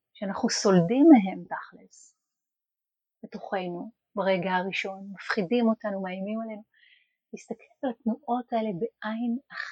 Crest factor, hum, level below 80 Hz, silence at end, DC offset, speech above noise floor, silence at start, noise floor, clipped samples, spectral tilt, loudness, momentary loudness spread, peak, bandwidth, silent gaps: 22 dB; none; -74 dBFS; 0 s; under 0.1%; 63 dB; 0.2 s; -90 dBFS; under 0.1%; -5.5 dB/octave; -26 LUFS; 21 LU; -6 dBFS; 9.4 kHz; none